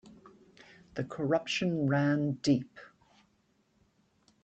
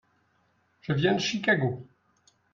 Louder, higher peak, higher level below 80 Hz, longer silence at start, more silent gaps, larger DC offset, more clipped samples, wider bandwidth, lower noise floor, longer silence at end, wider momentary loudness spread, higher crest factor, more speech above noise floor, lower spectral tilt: second, -31 LUFS vs -26 LUFS; second, -16 dBFS vs -10 dBFS; second, -70 dBFS vs -64 dBFS; second, 0.25 s vs 0.9 s; neither; neither; neither; first, 8.4 kHz vs 7.4 kHz; about the same, -72 dBFS vs -69 dBFS; first, 1.55 s vs 0.7 s; about the same, 12 LU vs 14 LU; about the same, 18 dB vs 20 dB; about the same, 42 dB vs 43 dB; about the same, -6 dB/octave vs -5 dB/octave